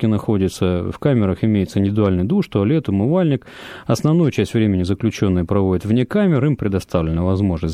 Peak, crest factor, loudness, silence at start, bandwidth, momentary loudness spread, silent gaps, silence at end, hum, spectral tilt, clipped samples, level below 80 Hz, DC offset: -2 dBFS; 14 dB; -18 LUFS; 0 s; 14.5 kHz; 4 LU; none; 0 s; none; -8 dB/octave; under 0.1%; -40 dBFS; under 0.1%